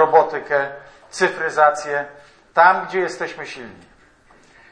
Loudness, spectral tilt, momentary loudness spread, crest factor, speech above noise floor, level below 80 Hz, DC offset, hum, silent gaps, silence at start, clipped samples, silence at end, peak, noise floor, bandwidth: -19 LUFS; -4 dB/octave; 20 LU; 20 dB; 33 dB; -62 dBFS; under 0.1%; none; none; 0 s; under 0.1%; 1 s; 0 dBFS; -52 dBFS; 10.5 kHz